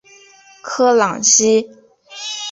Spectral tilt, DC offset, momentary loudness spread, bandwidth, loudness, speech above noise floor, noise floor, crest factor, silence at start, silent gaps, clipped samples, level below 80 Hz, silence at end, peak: -1.5 dB/octave; under 0.1%; 20 LU; 8 kHz; -14 LUFS; 31 dB; -46 dBFS; 16 dB; 0.65 s; none; under 0.1%; -62 dBFS; 0 s; 0 dBFS